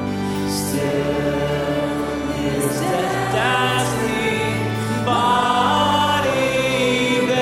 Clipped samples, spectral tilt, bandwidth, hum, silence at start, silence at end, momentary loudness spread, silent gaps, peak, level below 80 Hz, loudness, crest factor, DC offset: under 0.1%; -4.5 dB/octave; 16 kHz; none; 0 s; 0 s; 6 LU; none; -4 dBFS; -42 dBFS; -19 LUFS; 14 dB; under 0.1%